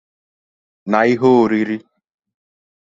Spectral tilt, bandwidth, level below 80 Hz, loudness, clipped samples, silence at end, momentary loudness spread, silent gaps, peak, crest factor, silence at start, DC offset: -7.5 dB/octave; 7.6 kHz; -62 dBFS; -15 LUFS; under 0.1%; 1.1 s; 14 LU; none; -2 dBFS; 18 dB; 0.85 s; under 0.1%